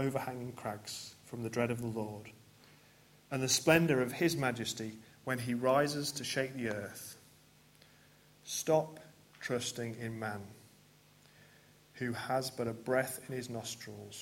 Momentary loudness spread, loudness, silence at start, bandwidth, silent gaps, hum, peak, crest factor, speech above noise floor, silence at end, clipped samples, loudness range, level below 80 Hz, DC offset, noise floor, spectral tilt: 16 LU; -35 LUFS; 0 s; 16.5 kHz; none; none; -10 dBFS; 26 dB; 28 dB; 0 s; under 0.1%; 9 LU; -72 dBFS; under 0.1%; -63 dBFS; -4 dB/octave